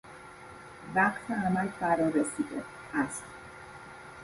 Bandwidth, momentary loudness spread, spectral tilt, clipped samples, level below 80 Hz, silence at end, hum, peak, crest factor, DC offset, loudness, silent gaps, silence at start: 11.5 kHz; 20 LU; -5.5 dB/octave; under 0.1%; -62 dBFS; 0 s; none; -12 dBFS; 20 dB; under 0.1%; -30 LUFS; none; 0.05 s